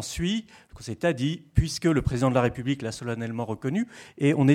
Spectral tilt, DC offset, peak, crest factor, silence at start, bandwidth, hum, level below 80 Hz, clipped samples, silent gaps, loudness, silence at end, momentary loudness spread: -6 dB/octave; under 0.1%; -6 dBFS; 20 dB; 0 s; 15 kHz; none; -42 dBFS; under 0.1%; none; -27 LUFS; 0 s; 8 LU